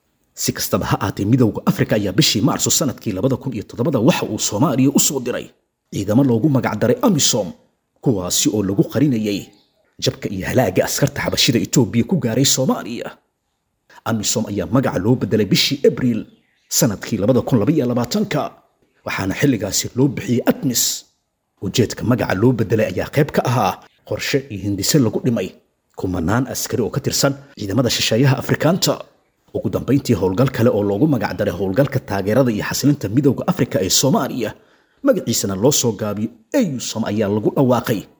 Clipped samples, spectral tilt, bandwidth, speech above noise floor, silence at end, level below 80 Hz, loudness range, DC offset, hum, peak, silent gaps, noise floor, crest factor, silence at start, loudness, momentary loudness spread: under 0.1%; -4.5 dB/octave; over 20 kHz; 53 dB; 0.15 s; -48 dBFS; 2 LU; under 0.1%; none; -2 dBFS; none; -71 dBFS; 16 dB; 0.35 s; -18 LUFS; 9 LU